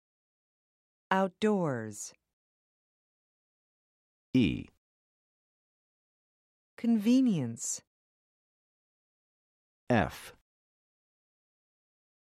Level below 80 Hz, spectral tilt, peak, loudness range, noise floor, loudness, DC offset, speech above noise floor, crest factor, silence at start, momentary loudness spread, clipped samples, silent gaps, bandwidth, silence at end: -62 dBFS; -5.5 dB/octave; -12 dBFS; 5 LU; under -90 dBFS; -30 LUFS; under 0.1%; over 61 dB; 24 dB; 1.1 s; 15 LU; under 0.1%; 2.33-4.33 s, 4.78-6.77 s, 7.87-9.87 s; 14.5 kHz; 1.95 s